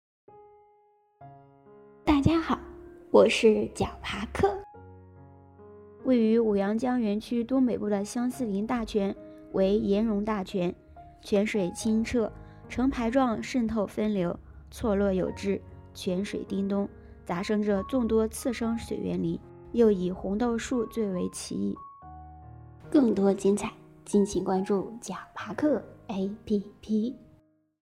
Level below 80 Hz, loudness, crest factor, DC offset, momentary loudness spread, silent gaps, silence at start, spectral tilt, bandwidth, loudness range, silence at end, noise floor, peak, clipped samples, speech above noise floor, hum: -50 dBFS; -28 LUFS; 22 dB; under 0.1%; 15 LU; none; 0.35 s; -6 dB/octave; 13.5 kHz; 4 LU; 0.7 s; -64 dBFS; -6 dBFS; under 0.1%; 37 dB; none